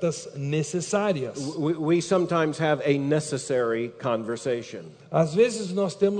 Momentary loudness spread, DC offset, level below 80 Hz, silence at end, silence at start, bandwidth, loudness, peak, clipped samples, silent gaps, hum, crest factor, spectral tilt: 7 LU; under 0.1%; -68 dBFS; 0 s; 0 s; 9.4 kHz; -25 LUFS; -8 dBFS; under 0.1%; none; none; 16 dB; -5.5 dB/octave